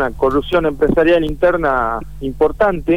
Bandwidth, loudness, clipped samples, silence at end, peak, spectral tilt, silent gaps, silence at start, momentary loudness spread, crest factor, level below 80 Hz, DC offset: 15 kHz; -16 LUFS; under 0.1%; 0 s; -4 dBFS; -7.5 dB/octave; none; 0 s; 6 LU; 12 dB; -32 dBFS; 2%